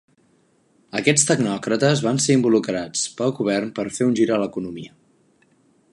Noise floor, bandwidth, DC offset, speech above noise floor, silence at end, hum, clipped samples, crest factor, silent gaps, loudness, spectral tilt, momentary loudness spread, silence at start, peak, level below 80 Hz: -61 dBFS; 11.5 kHz; under 0.1%; 41 dB; 1.05 s; none; under 0.1%; 20 dB; none; -20 LUFS; -4.5 dB/octave; 10 LU; 0.95 s; -2 dBFS; -62 dBFS